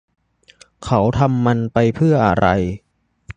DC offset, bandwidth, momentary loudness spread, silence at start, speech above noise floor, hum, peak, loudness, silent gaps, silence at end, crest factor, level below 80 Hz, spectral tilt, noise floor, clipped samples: under 0.1%; 9.2 kHz; 10 LU; 0.8 s; 35 dB; none; 0 dBFS; -17 LUFS; none; 0.05 s; 18 dB; -38 dBFS; -8 dB/octave; -50 dBFS; under 0.1%